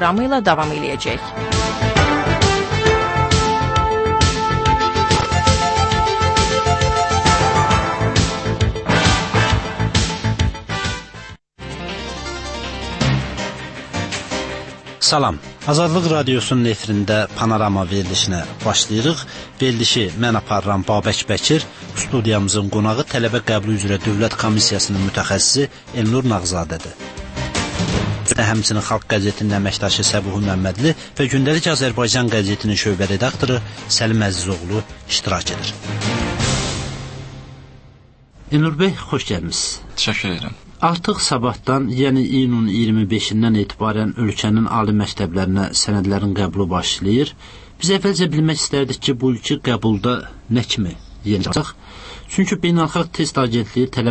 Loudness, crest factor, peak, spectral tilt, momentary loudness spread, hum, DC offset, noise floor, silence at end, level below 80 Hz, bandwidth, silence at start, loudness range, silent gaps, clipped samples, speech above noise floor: -18 LUFS; 16 dB; -2 dBFS; -4.5 dB/octave; 9 LU; none; under 0.1%; -46 dBFS; 0 s; -34 dBFS; 8.8 kHz; 0 s; 6 LU; none; under 0.1%; 28 dB